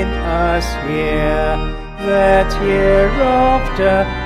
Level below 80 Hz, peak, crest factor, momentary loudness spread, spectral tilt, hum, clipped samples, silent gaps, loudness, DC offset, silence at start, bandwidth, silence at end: -22 dBFS; -2 dBFS; 14 dB; 7 LU; -6.5 dB/octave; none; under 0.1%; none; -15 LUFS; under 0.1%; 0 s; 13.5 kHz; 0 s